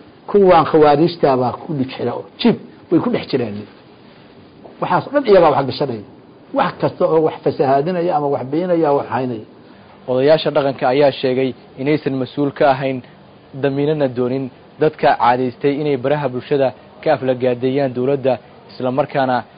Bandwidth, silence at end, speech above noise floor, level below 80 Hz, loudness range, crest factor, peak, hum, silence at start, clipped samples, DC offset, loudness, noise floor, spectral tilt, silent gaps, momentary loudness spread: 5.2 kHz; 0.15 s; 27 dB; -54 dBFS; 3 LU; 14 dB; -2 dBFS; none; 0.3 s; under 0.1%; under 0.1%; -17 LUFS; -43 dBFS; -12 dB/octave; none; 11 LU